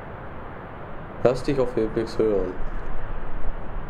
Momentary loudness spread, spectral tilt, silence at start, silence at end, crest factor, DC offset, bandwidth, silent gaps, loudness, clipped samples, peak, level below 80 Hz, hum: 15 LU; -7.5 dB/octave; 0 s; 0 s; 18 dB; under 0.1%; 9.2 kHz; none; -26 LUFS; under 0.1%; -6 dBFS; -32 dBFS; none